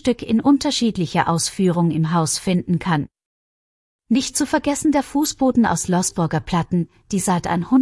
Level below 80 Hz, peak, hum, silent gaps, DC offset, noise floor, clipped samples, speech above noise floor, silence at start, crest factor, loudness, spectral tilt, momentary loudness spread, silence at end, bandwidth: -48 dBFS; -4 dBFS; none; 3.26-3.99 s; under 0.1%; under -90 dBFS; under 0.1%; over 71 dB; 0.05 s; 14 dB; -19 LUFS; -5 dB/octave; 5 LU; 0 s; 12 kHz